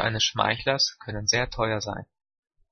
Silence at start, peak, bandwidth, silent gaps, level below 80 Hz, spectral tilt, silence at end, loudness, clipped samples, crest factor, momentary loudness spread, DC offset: 0 s; -6 dBFS; 6.6 kHz; none; -48 dBFS; -2.5 dB/octave; 0.7 s; -25 LUFS; under 0.1%; 22 dB; 8 LU; under 0.1%